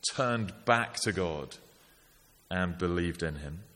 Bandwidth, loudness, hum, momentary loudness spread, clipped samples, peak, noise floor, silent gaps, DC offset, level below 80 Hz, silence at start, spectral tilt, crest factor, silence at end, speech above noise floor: 17 kHz; -32 LUFS; none; 13 LU; under 0.1%; -8 dBFS; -62 dBFS; none; under 0.1%; -52 dBFS; 0.05 s; -4.5 dB/octave; 24 dB; 0.1 s; 30 dB